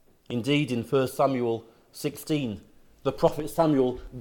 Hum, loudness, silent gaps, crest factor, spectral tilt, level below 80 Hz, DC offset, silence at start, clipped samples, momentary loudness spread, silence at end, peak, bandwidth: none; -27 LUFS; none; 20 dB; -6 dB/octave; -52 dBFS; under 0.1%; 0.3 s; under 0.1%; 11 LU; 0 s; -8 dBFS; 18 kHz